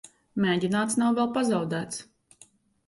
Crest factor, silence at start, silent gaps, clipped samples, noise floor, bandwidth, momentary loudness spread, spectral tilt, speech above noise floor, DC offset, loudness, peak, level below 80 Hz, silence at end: 14 dB; 0.05 s; none; under 0.1%; -58 dBFS; 11.5 kHz; 12 LU; -5 dB/octave; 33 dB; under 0.1%; -26 LUFS; -12 dBFS; -66 dBFS; 0.85 s